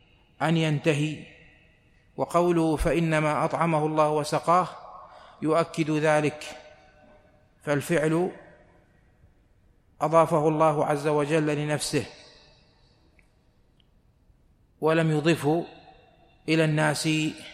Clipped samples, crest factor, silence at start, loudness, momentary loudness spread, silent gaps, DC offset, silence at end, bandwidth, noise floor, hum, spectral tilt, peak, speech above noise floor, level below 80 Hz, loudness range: under 0.1%; 20 dB; 0.4 s; -25 LUFS; 15 LU; none; under 0.1%; 0 s; 14.5 kHz; -62 dBFS; none; -6 dB/octave; -6 dBFS; 38 dB; -50 dBFS; 7 LU